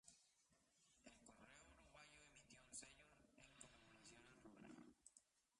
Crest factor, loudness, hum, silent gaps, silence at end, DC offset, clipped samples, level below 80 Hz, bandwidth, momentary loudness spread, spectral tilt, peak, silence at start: 24 dB; -65 LUFS; none; none; 0 s; under 0.1%; under 0.1%; -84 dBFS; 11 kHz; 9 LU; -2.5 dB/octave; -44 dBFS; 0.05 s